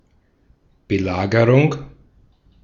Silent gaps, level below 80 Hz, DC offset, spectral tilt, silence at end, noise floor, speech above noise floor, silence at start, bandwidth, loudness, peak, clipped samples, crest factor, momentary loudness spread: none; -48 dBFS; under 0.1%; -8 dB/octave; 0.75 s; -59 dBFS; 42 dB; 0.9 s; 7.2 kHz; -17 LUFS; -2 dBFS; under 0.1%; 20 dB; 10 LU